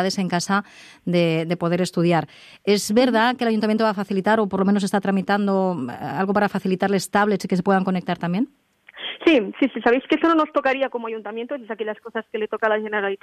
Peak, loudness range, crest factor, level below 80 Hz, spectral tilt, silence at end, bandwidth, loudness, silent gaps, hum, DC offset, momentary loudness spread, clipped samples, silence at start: -6 dBFS; 2 LU; 16 dB; -62 dBFS; -5.5 dB/octave; 0.05 s; 14 kHz; -21 LUFS; none; none; under 0.1%; 11 LU; under 0.1%; 0 s